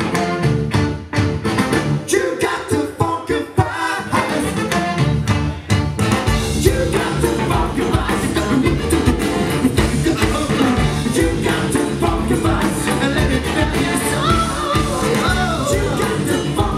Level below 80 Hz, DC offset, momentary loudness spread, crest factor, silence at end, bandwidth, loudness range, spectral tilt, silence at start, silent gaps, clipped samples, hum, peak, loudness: -28 dBFS; under 0.1%; 3 LU; 16 dB; 0 s; 15.5 kHz; 2 LU; -5.5 dB/octave; 0 s; none; under 0.1%; none; 0 dBFS; -18 LUFS